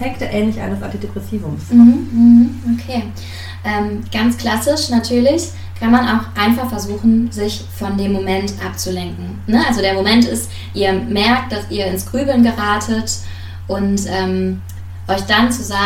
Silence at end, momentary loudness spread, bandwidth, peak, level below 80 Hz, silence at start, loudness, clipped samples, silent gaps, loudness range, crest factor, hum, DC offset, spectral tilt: 0 s; 13 LU; 16 kHz; 0 dBFS; -40 dBFS; 0 s; -16 LUFS; under 0.1%; none; 4 LU; 16 dB; none; under 0.1%; -5 dB/octave